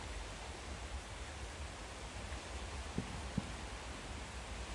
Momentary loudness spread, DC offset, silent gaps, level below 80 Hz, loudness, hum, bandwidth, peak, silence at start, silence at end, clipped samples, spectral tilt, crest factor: 4 LU; under 0.1%; none; -50 dBFS; -46 LUFS; none; 11.5 kHz; -22 dBFS; 0 s; 0 s; under 0.1%; -4 dB/octave; 22 dB